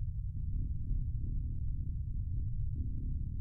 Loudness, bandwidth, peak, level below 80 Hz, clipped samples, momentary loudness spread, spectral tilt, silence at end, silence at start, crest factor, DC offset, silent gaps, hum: -40 LUFS; 0.5 kHz; -24 dBFS; -38 dBFS; under 0.1%; 1 LU; -20 dB/octave; 0 s; 0 s; 12 dB; under 0.1%; none; none